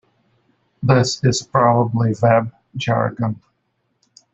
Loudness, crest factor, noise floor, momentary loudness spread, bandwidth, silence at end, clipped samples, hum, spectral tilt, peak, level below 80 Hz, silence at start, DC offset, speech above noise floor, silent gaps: -18 LUFS; 18 dB; -69 dBFS; 10 LU; 8 kHz; 0.95 s; under 0.1%; none; -6 dB/octave; -2 dBFS; -52 dBFS; 0.8 s; under 0.1%; 52 dB; none